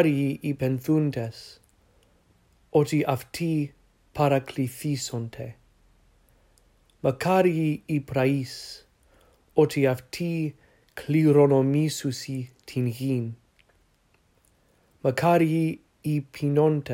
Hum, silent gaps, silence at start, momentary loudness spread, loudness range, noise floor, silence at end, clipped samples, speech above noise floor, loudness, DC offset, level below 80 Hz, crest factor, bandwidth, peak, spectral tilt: none; none; 0 s; 15 LU; 6 LU; -65 dBFS; 0 s; under 0.1%; 41 dB; -25 LUFS; under 0.1%; -62 dBFS; 20 dB; 16 kHz; -6 dBFS; -7 dB/octave